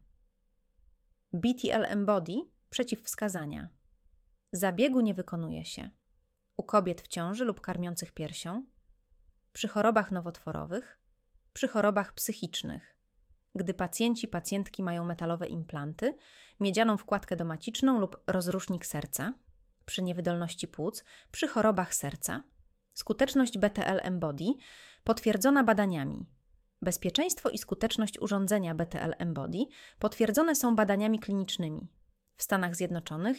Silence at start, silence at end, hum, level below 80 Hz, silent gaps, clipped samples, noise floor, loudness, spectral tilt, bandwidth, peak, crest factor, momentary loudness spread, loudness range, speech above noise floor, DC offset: 1.35 s; 0 s; none; -60 dBFS; none; under 0.1%; -74 dBFS; -32 LUFS; -4.5 dB/octave; 17 kHz; -12 dBFS; 20 dB; 13 LU; 5 LU; 42 dB; under 0.1%